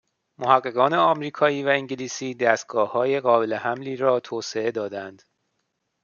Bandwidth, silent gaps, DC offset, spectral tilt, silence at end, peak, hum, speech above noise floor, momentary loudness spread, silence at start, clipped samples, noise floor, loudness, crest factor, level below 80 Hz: 7.2 kHz; none; under 0.1%; -4.5 dB/octave; 0.9 s; -2 dBFS; none; 53 dB; 11 LU; 0.4 s; under 0.1%; -76 dBFS; -23 LUFS; 22 dB; -74 dBFS